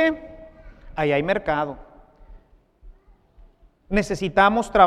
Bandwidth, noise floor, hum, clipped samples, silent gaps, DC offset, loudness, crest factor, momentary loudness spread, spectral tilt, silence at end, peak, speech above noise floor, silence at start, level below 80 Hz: 13 kHz; -53 dBFS; none; under 0.1%; none; under 0.1%; -22 LUFS; 22 dB; 22 LU; -5.5 dB/octave; 0 s; 0 dBFS; 33 dB; 0 s; -42 dBFS